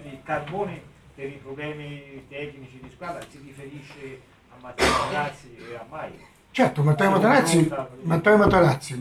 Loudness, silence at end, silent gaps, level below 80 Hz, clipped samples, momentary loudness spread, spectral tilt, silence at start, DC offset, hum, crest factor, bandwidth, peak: -21 LUFS; 0 s; none; -48 dBFS; under 0.1%; 23 LU; -5.5 dB/octave; 0 s; under 0.1%; none; 22 dB; 15 kHz; -2 dBFS